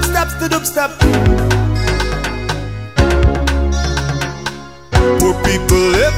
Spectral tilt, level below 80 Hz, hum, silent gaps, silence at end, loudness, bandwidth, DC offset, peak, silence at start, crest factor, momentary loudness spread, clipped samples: -5 dB/octave; -20 dBFS; none; none; 0 s; -15 LUFS; 16.5 kHz; 0.6%; 0 dBFS; 0 s; 14 dB; 9 LU; under 0.1%